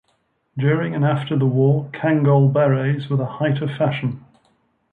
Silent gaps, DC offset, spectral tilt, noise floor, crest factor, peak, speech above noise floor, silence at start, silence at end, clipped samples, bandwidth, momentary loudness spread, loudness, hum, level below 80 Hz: none; under 0.1%; -10 dB/octave; -66 dBFS; 14 dB; -6 dBFS; 48 dB; 0.55 s; 0.75 s; under 0.1%; 4 kHz; 8 LU; -19 LUFS; none; -62 dBFS